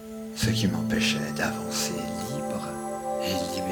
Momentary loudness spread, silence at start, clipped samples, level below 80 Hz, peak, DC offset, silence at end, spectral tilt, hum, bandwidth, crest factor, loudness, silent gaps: 8 LU; 0 s; under 0.1%; -52 dBFS; -12 dBFS; under 0.1%; 0 s; -4 dB/octave; none; 19 kHz; 18 dB; -28 LUFS; none